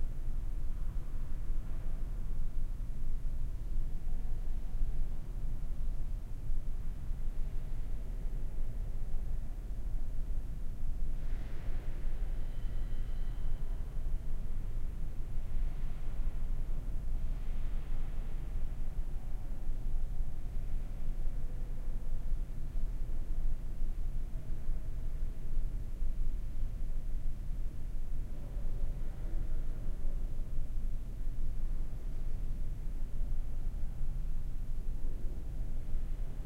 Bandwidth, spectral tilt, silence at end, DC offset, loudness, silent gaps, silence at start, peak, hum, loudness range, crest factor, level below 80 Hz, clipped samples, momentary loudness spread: 2.5 kHz; -7.5 dB/octave; 0 s; under 0.1%; -43 LUFS; none; 0 s; -20 dBFS; none; 1 LU; 12 dB; -32 dBFS; under 0.1%; 2 LU